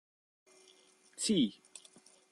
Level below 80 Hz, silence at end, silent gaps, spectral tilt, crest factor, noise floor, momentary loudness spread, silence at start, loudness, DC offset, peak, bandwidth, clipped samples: -74 dBFS; 0.8 s; none; -4 dB/octave; 20 dB; -65 dBFS; 23 LU; 1.2 s; -33 LUFS; under 0.1%; -20 dBFS; 12.5 kHz; under 0.1%